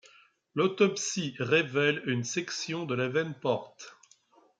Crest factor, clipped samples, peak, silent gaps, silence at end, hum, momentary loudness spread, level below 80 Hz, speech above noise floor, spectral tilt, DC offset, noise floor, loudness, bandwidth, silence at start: 20 dB; under 0.1%; -10 dBFS; none; 0.65 s; none; 10 LU; -76 dBFS; 34 dB; -4 dB/octave; under 0.1%; -63 dBFS; -29 LUFS; 9.4 kHz; 0.55 s